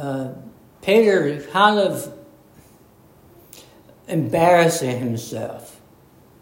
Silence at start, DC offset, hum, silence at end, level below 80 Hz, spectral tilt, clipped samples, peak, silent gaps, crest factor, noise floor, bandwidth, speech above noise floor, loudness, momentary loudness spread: 0 s; under 0.1%; none; 0.7 s; -60 dBFS; -5 dB/octave; under 0.1%; 0 dBFS; none; 20 dB; -51 dBFS; 16.5 kHz; 32 dB; -19 LUFS; 18 LU